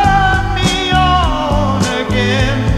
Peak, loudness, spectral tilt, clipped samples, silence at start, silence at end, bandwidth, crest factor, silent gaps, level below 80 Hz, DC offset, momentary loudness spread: 0 dBFS; -13 LUFS; -5 dB/octave; under 0.1%; 0 s; 0 s; 14 kHz; 12 dB; none; -20 dBFS; 0.2%; 4 LU